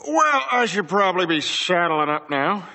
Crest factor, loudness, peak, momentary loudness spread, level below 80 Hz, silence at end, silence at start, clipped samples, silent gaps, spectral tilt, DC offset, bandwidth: 16 dB; -20 LUFS; -6 dBFS; 4 LU; -76 dBFS; 0 s; 0.05 s; under 0.1%; none; -3.5 dB/octave; under 0.1%; 8.4 kHz